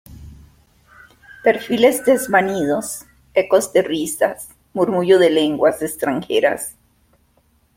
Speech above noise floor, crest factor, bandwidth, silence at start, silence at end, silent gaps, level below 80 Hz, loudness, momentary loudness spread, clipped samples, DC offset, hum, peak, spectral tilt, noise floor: 43 dB; 18 dB; 16.5 kHz; 0.1 s; 1.05 s; none; -52 dBFS; -17 LUFS; 11 LU; under 0.1%; under 0.1%; none; -2 dBFS; -4 dB/octave; -59 dBFS